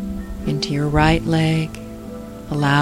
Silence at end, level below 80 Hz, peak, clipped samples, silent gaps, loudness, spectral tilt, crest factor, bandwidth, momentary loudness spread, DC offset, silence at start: 0 s; -32 dBFS; -2 dBFS; under 0.1%; none; -20 LUFS; -6.5 dB/octave; 18 dB; 15 kHz; 17 LU; under 0.1%; 0 s